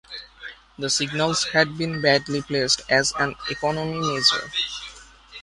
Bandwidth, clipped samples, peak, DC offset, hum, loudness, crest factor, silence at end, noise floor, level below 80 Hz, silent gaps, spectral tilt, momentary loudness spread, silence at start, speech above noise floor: 11.5 kHz; under 0.1%; -4 dBFS; under 0.1%; none; -22 LUFS; 20 dB; 0 s; -45 dBFS; -54 dBFS; none; -3 dB/octave; 19 LU; 0.1 s; 22 dB